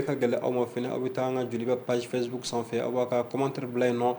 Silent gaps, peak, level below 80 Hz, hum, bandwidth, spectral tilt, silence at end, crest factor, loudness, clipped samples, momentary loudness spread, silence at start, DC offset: none; -12 dBFS; -72 dBFS; none; over 20 kHz; -6 dB/octave; 0 s; 16 dB; -29 LUFS; under 0.1%; 4 LU; 0 s; under 0.1%